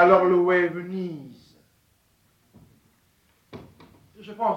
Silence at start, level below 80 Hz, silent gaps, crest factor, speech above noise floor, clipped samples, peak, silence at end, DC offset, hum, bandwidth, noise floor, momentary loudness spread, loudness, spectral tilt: 0 s; -64 dBFS; none; 20 dB; 43 dB; under 0.1%; -6 dBFS; 0 s; under 0.1%; none; 6 kHz; -65 dBFS; 29 LU; -22 LUFS; -8 dB/octave